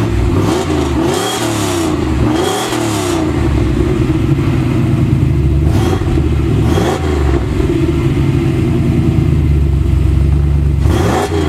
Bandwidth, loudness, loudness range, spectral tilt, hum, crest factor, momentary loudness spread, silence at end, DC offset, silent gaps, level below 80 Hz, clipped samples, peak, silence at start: 15 kHz; -13 LUFS; 1 LU; -6.5 dB/octave; none; 12 dB; 2 LU; 0 s; under 0.1%; none; -18 dBFS; under 0.1%; 0 dBFS; 0 s